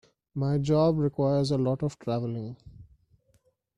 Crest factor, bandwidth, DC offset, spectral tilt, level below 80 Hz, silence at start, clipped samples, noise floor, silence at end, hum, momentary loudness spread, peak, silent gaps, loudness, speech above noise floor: 16 dB; 10.5 kHz; under 0.1%; -8 dB/octave; -56 dBFS; 0.35 s; under 0.1%; -68 dBFS; 0.95 s; none; 15 LU; -12 dBFS; none; -27 LUFS; 42 dB